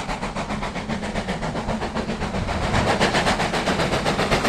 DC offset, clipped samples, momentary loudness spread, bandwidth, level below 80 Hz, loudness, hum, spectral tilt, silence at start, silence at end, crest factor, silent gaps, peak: under 0.1%; under 0.1%; 8 LU; 14.5 kHz; -34 dBFS; -23 LUFS; none; -4.5 dB/octave; 0 s; 0 s; 18 dB; none; -4 dBFS